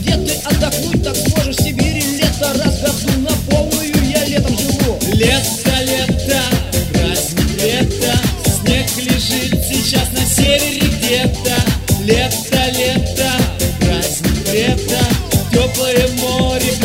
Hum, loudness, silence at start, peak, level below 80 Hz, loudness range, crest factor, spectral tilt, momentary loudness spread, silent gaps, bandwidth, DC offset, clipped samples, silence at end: none; -14 LUFS; 0 s; 0 dBFS; -24 dBFS; 1 LU; 14 dB; -4 dB/octave; 2 LU; none; 16.5 kHz; under 0.1%; under 0.1%; 0 s